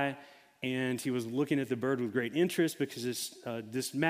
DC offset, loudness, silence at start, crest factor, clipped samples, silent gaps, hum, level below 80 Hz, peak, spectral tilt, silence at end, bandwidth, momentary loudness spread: under 0.1%; -33 LUFS; 0 s; 20 dB; under 0.1%; none; none; -78 dBFS; -14 dBFS; -5 dB/octave; 0 s; 16 kHz; 7 LU